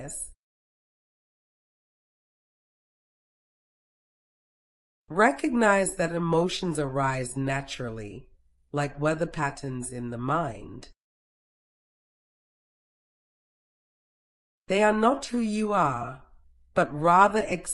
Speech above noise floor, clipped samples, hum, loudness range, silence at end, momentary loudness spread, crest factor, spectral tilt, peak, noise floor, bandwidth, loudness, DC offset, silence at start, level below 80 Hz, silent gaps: 30 dB; under 0.1%; none; 10 LU; 0 s; 14 LU; 24 dB; -5 dB/octave; -6 dBFS; -56 dBFS; 13.5 kHz; -26 LUFS; under 0.1%; 0 s; -54 dBFS; 0.37-5.05 s, 11.00-14.65 s